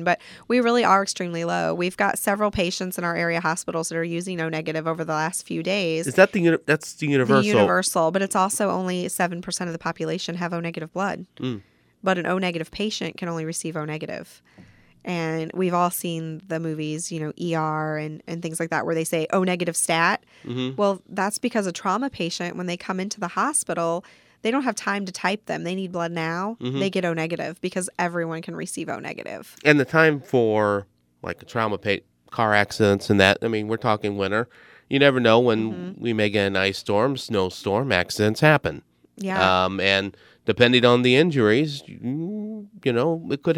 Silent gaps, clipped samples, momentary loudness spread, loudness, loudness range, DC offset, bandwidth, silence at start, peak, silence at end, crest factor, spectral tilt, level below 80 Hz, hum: none; under 0.1%; 12 LU; -23 LUFS; 7 LU; under 0.1%; 17.5 kHz; 0 s; 0 dBFS; 0 s; 24 dB; -4.5 dB/octave; -58 dBFS; none